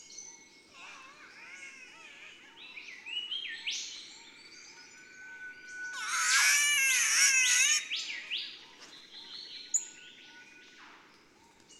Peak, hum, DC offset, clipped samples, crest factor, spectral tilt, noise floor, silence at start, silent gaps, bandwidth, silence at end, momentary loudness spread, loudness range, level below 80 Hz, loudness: -12 dBFS; none; under 0.1%; under 0.1%; 22 dB; 4.5 dB/octave; -61 dBFS; 0 s; none; 16 kHz; 0.05 s; 27 LU; 15 LU; -84 dBFS; -27 LUFS